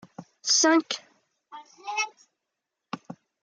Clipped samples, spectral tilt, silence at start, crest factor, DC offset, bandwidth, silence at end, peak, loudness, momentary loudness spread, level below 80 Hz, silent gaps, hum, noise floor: under 0.1%; -1 dB/octave; 0.2 s; 20 dB; under 0.1%; 10 kHz; 0.3 s; -8 dBFS; -24 LUFS; 22 LU; -86 dBFS; none; none; -85 dBFS